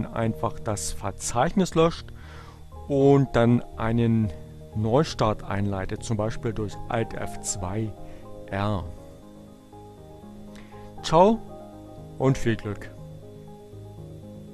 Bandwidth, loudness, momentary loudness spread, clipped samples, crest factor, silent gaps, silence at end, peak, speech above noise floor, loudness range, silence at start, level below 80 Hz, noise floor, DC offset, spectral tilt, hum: 13 kHz; -25 LUFS; 23 LU; under 0.1%; 20 dB; none; 0 s; -6 dBFS; 22 dB; 9 LU; 0 s; -42 dBFS; -46 dBFS; under 0.1%; -6 dB/octave; none